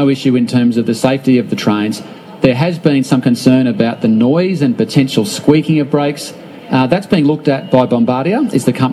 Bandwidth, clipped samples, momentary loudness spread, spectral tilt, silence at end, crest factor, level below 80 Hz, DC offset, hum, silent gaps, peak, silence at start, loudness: 13 kHz; under 0.1%; 5 LU; -6.5 dB/octave; 0 s; 12 dB; -52 dBFS; under 0.1%; none; none; 0 dBFS; 0 s; -13 LUFS